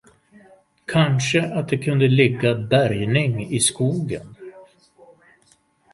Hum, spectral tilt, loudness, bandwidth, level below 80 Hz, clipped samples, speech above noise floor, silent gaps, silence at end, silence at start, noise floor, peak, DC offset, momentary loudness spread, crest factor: none; -5 dB/octave; -20 LUFS; 11.5 kHz; -54 dBFS; under 0.1%; 41 dB; none; 1.3 s; 0.9 s; -60 dBFS; -2 dBFS; under 0.1%; 13 LU; 20 dB